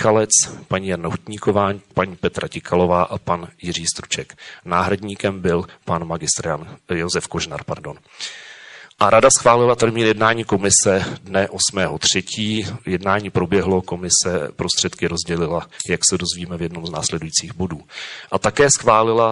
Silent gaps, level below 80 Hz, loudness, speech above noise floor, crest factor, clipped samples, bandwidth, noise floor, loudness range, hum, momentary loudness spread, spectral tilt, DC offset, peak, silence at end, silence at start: none; -44 dBFS; -18 LUFS; 22 dB; 20 dB; under 0.1%; 11.5 kHz; -41 dBFS; 7 LU; none; 13 LU; -3 dB/octave; under 0.1%; 0 dBFS; 0 s; 0 s